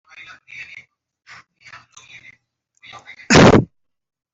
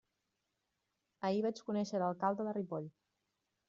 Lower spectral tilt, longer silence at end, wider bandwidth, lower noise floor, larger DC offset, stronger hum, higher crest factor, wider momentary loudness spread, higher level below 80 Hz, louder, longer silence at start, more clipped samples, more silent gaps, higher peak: about the same, -5 dB/octave vs -6 dB/octave; about the same, 0.7 s vs 0.8 s; about the same, 8.2 kHz vs 7.6 kHz; second, -62 dBFS vs -86 dBFS; neither; neither; about the same, 20 dB vs 20 dB; first, 28 LU vs 8 LU; first, -42 dBFS vs -82 dBFS; first, -12 LUFS vs -38 LUFS; second, 0.6 s vs 1.2 s; neither; neither; first, 0 dBFS vs -20 dBFS